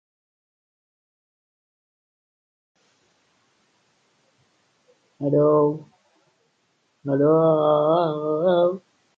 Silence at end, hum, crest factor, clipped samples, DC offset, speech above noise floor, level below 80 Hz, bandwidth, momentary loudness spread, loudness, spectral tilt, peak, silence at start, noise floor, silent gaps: 0.4 s; none; 18 dB; under 0.1%; under 0.1%; 49 dB; -76 dBFS; 4.9 kHz; 13 LU; -20 LUFS; -9.5 dB/octave; -8 dBFS; 5.2 s; -69 dBFS; none